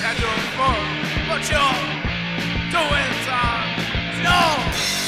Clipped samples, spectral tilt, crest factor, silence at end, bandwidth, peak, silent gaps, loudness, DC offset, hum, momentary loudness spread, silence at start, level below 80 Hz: under 0.1%; -3.5 dB/octave; 16 dB; 0 s; 16 kHz; -6 dBFS; none; -20 LUFS; under 0.1%; none; 6 LU; 0 s; -34 dBFS